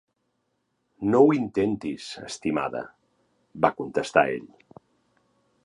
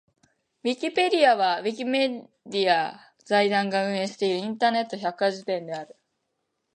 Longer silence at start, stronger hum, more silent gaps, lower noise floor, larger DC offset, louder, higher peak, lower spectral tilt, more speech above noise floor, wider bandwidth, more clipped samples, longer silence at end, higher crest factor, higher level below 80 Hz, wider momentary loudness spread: first, 1 s vs 0.65 s; neither; neither; about the same, -75 dBFS vs -78 dBFS; neither; about the same, -25 LUFS vs -25 LUFS; about the same, -4 dBFS vs -6 dBFS; first, -6 dB/octave vs -4.5 dB/octave; about the same, 51 dB vs 53 dB; about the same, 11 kHz vs 11 kHz; neither; first, 1.2 s vs 0.9 s; first, 24 dB vs 18 dB; first, -62 dBFS vs -78 dBFS; first, 16 LU vs 12 LU